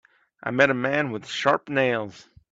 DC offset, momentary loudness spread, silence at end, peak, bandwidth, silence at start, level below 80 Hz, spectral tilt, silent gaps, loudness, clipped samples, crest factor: under 0.1%; 10 LU; 0.3 s; -4 dBFS; 7.8 kHz; 0.45 s; -66 dBFS; -5 dB/octave; none; -23 LUFS; under 0.1%; 22 dB